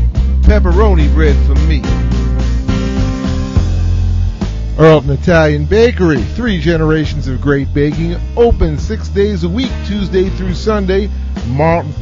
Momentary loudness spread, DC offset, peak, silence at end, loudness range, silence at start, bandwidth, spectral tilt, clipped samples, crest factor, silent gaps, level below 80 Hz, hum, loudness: 7 LU; under 0.1%; 0 dBFS; 0 s; 3 LU; 0 s; 7.4 kHz; -7.5 dB/octave; 0.1%; 12 dB; none; -16 dBFS; none; -13 LUFS